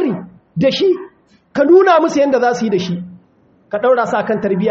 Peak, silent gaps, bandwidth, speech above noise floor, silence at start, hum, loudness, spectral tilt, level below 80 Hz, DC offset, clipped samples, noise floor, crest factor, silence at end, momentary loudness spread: 0 dBFS; none; 7.8 kHz; 39 dB; 0 s; none; -14 LUFS; -4.5 dB/octave; -58 dBFS; under 0.1%; under 0.1%; -52 dBFS; 14 dB; 0 s; 16 LU